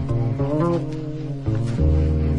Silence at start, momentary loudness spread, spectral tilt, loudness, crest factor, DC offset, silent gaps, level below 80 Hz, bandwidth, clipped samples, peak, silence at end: 0 s; 9 LU; -9.5 dB/octave; -23 LUFS; 14 dB; under 0.1%; none; -30 dBFS; 9.4 kHz; under 0.1%; -8 dBFS; 0 s